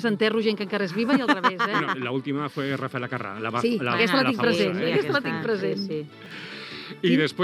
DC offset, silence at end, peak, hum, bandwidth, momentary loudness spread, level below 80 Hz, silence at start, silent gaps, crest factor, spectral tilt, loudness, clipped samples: under 0.1%; 0 s; -4 dBFS; none; 14 kHz; 13 LU; -76 dBFS; 0 s; none; 20 dB; -6 dB/octave; -24 LUFS; under 0.1%